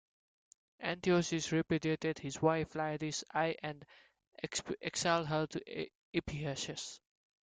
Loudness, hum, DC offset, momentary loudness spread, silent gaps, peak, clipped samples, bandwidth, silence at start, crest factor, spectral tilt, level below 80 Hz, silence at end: -36 LUFS; none; under 0.1%; 12 LU; 4.28-4.32 s, 5.95-6.13 s; -18 dBFS; under 0.1%; 9.6 kHz; 0.8 s; 20 dB; -4.5 dB/octave; -66 dBFS; 0.45 s